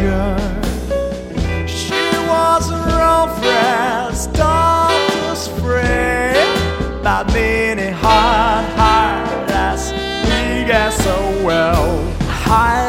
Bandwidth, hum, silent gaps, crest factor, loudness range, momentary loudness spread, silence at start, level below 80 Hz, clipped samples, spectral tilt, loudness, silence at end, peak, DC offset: 16.5 kHz; none; none; 14 dB; 2 LU; 8 LU; 0 s; -24 dBFS; under 0.1%; -4.5 dB/octave; -15 LUFS; 0 s; 0 dBFS; under 0.1%